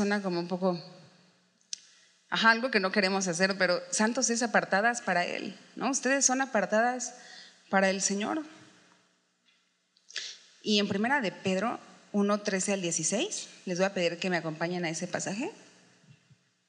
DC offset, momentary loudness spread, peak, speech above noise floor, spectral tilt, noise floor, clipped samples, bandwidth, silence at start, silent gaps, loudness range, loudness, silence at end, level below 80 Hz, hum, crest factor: under 0.1%; 14 LU; -8 dBFS; 42 dB; -3 dB/octave; -71 dBFS; under 0.1%; 11 kHz; 0 s; none; 6 LU; -29 LUFS; 1.1 s; -90 dBFS; none; 22 dB